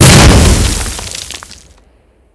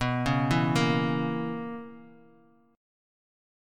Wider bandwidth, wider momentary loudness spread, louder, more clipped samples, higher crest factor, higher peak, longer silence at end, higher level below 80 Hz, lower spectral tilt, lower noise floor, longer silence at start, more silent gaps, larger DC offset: second, 11 kHz vs 14 kHz; first, 20 LU vs 15 LU; first, -8 LUFS vs -27 LUFS; first, 5% vs under 0.1%; second, 10 dB vs 20 dB; first, 0 dBFS vs -10 dBFS; second, 0.8 s vs 1.65 s; first, -14 dBFS vs -52 dBFS; second, -4 dB/octave vs -6.5 dB/octave; second, -48 dBFS vs -60 dBFS; about the same, 0 s vs 0 s; neither; neither